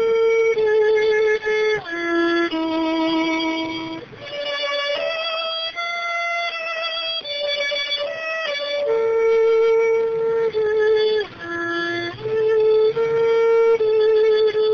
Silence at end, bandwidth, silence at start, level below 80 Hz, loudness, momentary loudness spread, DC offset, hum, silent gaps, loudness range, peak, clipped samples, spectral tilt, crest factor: 0 s; 6.6 kHz; 0 s; -58 dBFS; -20 LUFS; 8 LU; under 0.1%; none; none; 4 LU; -10 dBFS; under 0.1%; -4 dB/octave; 10 dB